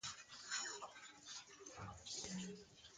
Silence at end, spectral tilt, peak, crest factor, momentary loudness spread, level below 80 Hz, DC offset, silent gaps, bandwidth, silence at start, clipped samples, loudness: 0 s; -2 dB/octave; -30 dBFS; 22 dB; 11 LU; -74 dBFS; under 0.1%; none; 9.6 kHz; 0 s; under 0.1%; -50 LUFS